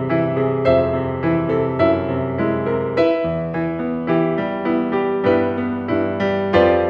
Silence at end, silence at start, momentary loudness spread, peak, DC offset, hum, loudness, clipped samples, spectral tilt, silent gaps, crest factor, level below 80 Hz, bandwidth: 0 s; 0 s; 6 LU; -2 dBFS; under 0.1%; none; -19 LUFS; under 0.1%; -9 dB/octave; none; 16 dB; -46 dBFS; 6.2 kHz